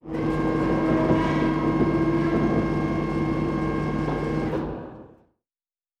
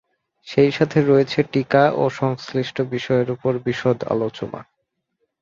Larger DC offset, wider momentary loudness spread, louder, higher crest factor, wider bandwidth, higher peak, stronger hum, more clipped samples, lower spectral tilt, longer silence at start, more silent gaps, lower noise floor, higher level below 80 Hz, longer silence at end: neither; second, 5 LU vs 8 LU; second, -24 LUFS vs -20 LUFS; about the same, 16 dB vs 18 dB; first, 8.8 kHz vs 7.4 kHz; second, -8 dBFS vs -2 dBFS; neither; neither; first, -8.5 dB/octave vs -7 dB/octave; second, 0.05 s vs 0.45 s; neither; first, under -90 dBFS vs -73 dBFS; first, -40 dBFS vs -58 dBFS; first, 0.95 s vs 0.8 s